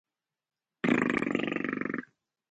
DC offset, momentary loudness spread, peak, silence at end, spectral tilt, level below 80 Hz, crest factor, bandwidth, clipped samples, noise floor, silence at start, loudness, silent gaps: under 0.1%; 8 LU; -12 dBFS; 0.5 s; -6.5 dB/octave; -70 dBFS; 22 dB; 9 kHz; under 0.1%; -50 dBFS; 0.85 s; -30 LUFS; none